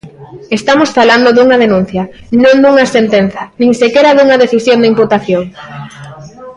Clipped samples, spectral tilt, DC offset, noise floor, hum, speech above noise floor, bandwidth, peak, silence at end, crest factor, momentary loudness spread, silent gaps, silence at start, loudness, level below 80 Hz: under 0.1%; -5.5 dB/octave; under 0.1%; -29 dBFS; none; 21 dB; 11 kHz; 0 dBFS; 0.05 s; 8 dB; 12 LU; none; 0.05 s; -8 LUFS; -46 dBFS